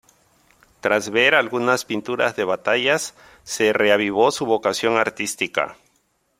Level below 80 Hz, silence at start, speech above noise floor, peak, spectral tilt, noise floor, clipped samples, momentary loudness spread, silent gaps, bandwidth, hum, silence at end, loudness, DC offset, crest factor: -64 dBFS; 0.85 s; 46 dB; -2 dBFS; -3 dB/octave; -66 dBFS; under 0.1%; 9 LU; none; 16 kHz; none; 0.65 s; -20 LUFS; under 0.1%; 20 dB